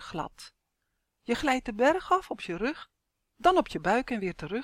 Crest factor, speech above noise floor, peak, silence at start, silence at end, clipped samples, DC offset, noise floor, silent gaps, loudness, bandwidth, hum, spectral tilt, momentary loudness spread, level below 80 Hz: 20 dB; 52 dB; -10 dBFS; 0 s; 0 s; under 0.1%; under 0.1%; -80 dBFS; none; -28 LUFS; 16 kHz; none; -5 dB/octave; 13 LU; -54 dBFS